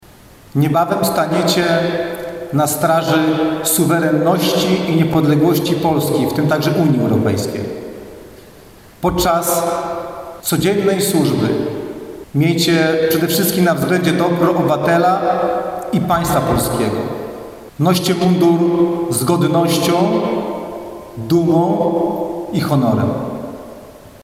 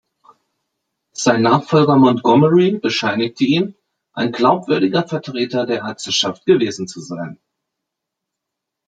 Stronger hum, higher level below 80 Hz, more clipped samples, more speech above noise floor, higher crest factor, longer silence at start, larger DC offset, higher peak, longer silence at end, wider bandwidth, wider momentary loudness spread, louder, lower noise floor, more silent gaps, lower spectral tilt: neither; first, -44 dBFS vs -62 dBFS; neither; second, 28 dB vs 65 dB; about the same, 12 dB vs 16 dB; second, 0.55 s vs 1.2 s; neither; about the same, -2 dBFS vs -2 dBFS; second, 0.15 s vs 1.55 s; first, 16 kHz vs 9.2 kHz; second, 12 LU vs 15 LU; about the same, -16 LUFS vs -16 LUFS; second, -42 dBFS vs -81 dBFS; neither; about the same, -5.5 dB/octave vs -5.5 dB/octave